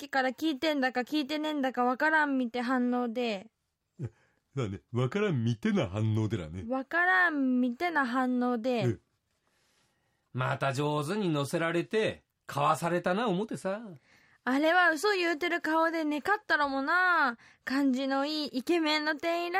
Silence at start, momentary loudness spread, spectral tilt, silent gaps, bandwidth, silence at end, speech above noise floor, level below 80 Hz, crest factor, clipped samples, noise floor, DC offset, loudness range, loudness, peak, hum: 0 s; 11 LU; -5.5 dB/octave; none; 15.5 kHz; 0 s; 46 dB; -70 dBFS; 16 dB; under 0.1%; -76 dBFS; under 0.1%; 5 LU; -29 LUFS; -14 dBFS; none